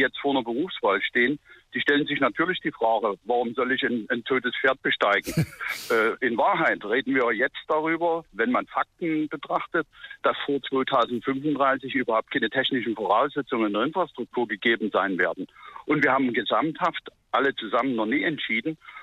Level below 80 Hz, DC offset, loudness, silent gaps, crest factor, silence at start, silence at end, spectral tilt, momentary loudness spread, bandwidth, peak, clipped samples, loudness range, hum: -64 dBFS; under 0.1%; -25 LUFS; none; 16 dB; 0 s; 0 s; -5.5 dB/octave; 6 LU; 14.5 kHz; -10 dBFS; under 0.1%; 2 LU; none